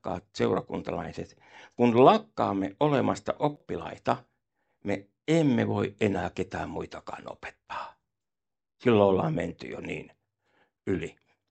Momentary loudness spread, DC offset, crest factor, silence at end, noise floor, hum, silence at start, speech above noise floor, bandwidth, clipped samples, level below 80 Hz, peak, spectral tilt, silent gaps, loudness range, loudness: 18 LU; under 0.1%; 22 dB; 0.4 s; under -90 dBFS; none; 0.05 s; over 63 dB; 8.8 kHz; under 0.1%; -60 dBFS; -6 dBFS; -7 dB/octave; none; 4 LU; -27 LUFS